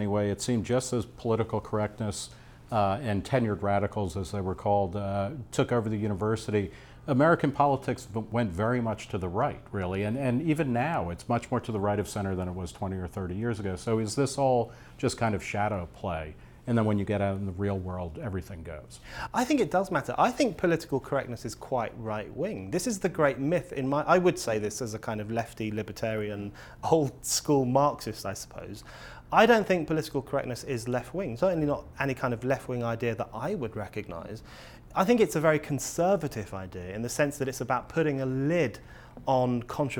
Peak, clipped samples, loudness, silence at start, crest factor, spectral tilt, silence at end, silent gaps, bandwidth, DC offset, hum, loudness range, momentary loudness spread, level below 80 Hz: -8 dBFS; under 0.1%; -29 LUFS; 0 s; 22 dB; -5.5 dB/octave; 0 s; none; 19 kHz; under 0.1%; none; 3 LU; 12 LU; -52 dBFS